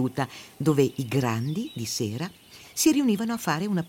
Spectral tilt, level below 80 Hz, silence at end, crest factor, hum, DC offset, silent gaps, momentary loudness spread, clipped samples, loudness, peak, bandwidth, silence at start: -5 dB/octave; -62 dBFS; 0 s; 16 dB; none; under 0.1%; none; 11 LU; under 0.1%; -26 LUFS; -10 dBFS; 17 kHz; 0 s